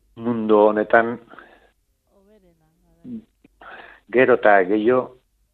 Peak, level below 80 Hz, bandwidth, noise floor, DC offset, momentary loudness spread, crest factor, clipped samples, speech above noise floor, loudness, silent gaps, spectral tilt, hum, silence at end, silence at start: 0 dBFS; -62 dBFS; 4.3 kHz; -64 dBFS; under 0.1%; 22 LU; 20 dB; under 0.1%; 47 dB; -18 LUFS; none; -8.5 dB/octave; none; 0.45 s; 0.15 s